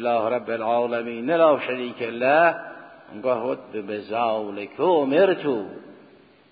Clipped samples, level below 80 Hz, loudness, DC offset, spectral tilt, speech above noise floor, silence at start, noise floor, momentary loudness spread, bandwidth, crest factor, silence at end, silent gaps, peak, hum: under 0.1%; -72 dBFS; -23 LUFS; under 0.1%; -10 dB/octave; 30 dB; 0 s; -52 dBFS; 15 LU; 5 kHz; 18 dB; 0.55 s; none; -6 dBFS; none